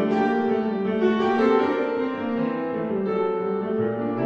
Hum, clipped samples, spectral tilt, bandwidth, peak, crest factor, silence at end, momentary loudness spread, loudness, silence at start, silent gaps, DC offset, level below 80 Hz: none; under 0.1%; -8 dB/octave; 7.2 kHz; -8 dBFS; 16 dB; 0 s; 6 LU; -23 LUFS; 0 s; none; under 0.1%; -64 dBFS